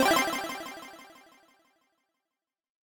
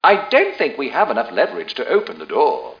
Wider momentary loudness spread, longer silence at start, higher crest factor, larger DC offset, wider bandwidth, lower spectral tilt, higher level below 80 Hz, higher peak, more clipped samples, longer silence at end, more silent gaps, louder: first, 25 LU vs 6 LU; about the same, 0 s vs 0 s; about the same, 20 dB vs 18 dB; neither; first, 19 kHz vs 5.2 kHz; second, -2 dB/octave vs -5 dB/octave; about the same, -66 dBFS vs -68 dBFS; second, -12 dBFS vs 0 dBFS; neither; first, 1.75 s vs 0.05 s; neither; second, -29 LUFS vs -18 LUFS